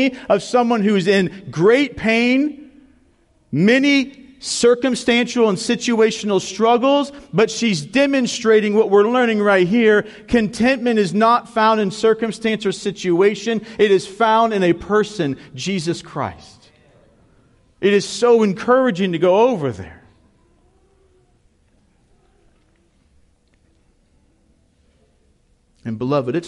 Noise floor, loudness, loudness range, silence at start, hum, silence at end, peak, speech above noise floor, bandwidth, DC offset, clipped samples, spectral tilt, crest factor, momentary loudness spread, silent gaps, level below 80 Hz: -59 dBFS; -17 LUFS; 6 LU; 0 s; none; 0 s; -4 dBFS; 42 dB; 11.5 kHz; under 0.1%; under 0.1%; -5 dB/octave; 14 dB; 10 LU; none; -52 dBFS